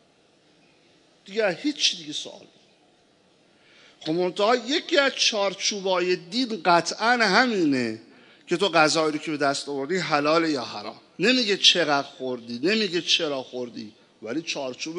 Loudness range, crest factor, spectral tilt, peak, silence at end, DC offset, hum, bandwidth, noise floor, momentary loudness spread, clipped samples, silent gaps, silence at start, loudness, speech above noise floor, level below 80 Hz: 7 LU; 22 dB; -3 dB/octave; -2 dBFS; 0 s; under 0.1%; none; 11 kHz; -60 dBFS; 14 LU; under 0.1%; none; 1.25 s; -23 LUFS; 37 dB; -82 dBFS